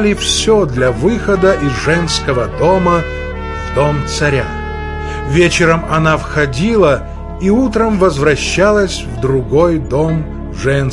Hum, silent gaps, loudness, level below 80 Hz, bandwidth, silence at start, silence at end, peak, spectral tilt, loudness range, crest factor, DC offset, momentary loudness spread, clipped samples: none; none; -13 LUFS; -26 dBFS; 11.5 kHz; 0 s; 0 s; 0 dBFS; -5 dB/octave; 2 LU; 12 dB; under 0.1%; 10 LU; under 0.1%